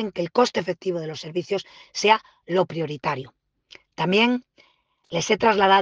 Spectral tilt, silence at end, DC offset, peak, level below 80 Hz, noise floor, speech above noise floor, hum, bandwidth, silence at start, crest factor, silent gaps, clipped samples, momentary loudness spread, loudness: -4.5 dB/octave; 0 s; under 0.1%; -4 dBFS; -64 dBFS; -63 dBFS; 40 dB; none; 10 kHz; 0 s; 20 dB; none; under 0.1%; 11 LU; -23 LUFS